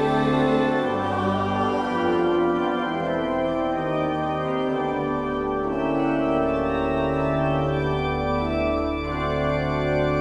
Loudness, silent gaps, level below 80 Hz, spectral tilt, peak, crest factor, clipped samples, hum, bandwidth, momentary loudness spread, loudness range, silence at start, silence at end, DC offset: -23 LUFS; none; -40 dBFS; -7.5 dB/octave; -8 dBFS; 14 dB; under 0.1%; none; 10.5 kHz; 4 LU; 2 LU; 0 s; 0 s; under 0.1%